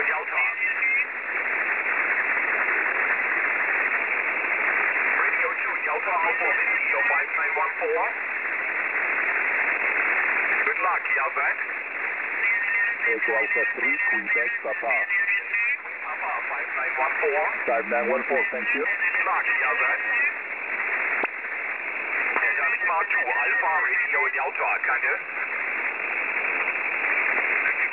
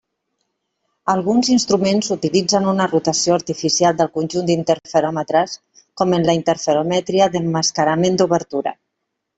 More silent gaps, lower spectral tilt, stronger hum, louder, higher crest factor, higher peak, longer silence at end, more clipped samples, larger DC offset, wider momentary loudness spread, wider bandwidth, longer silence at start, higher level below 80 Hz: neither; second, 0.5 dB/octave vs -4.5 dB/octave; neither; second, -22 LUFS vs -17 LUFS; about the same, 16 dB vs 16 dB; second, -8 dBFS vs -2 dBFS; second, 0 s vs 0.65 s; neither; first, 0.1% vs under 0.1%; about the same, 5 LU vs 5 LU; second, 4 kHz vs 8.4 kHz; second, 0 s vs 1.05 s; second, -76 dBFS vs -58 dBFS